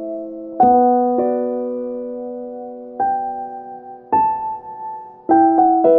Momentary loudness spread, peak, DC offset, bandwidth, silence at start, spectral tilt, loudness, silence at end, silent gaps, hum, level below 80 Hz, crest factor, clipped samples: 18 LU; -2 dBFS; under 0.1%; 2.8 kHz; 0 s; -11 dB/octave; -18 LUFS; 0 s; none; none; -56 dBFS; 14 dB; under 0.1%